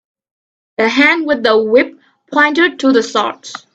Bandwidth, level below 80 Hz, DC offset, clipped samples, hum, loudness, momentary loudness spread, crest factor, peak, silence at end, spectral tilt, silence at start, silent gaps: 8.2 kHz; -60 dBFS; under 0.1%; under 0.1%; none; -13 LUFS; 10 LU; 14 dB; 0 dBFS; 0.15 s; -3.5 dB/octave; 0.8 s; none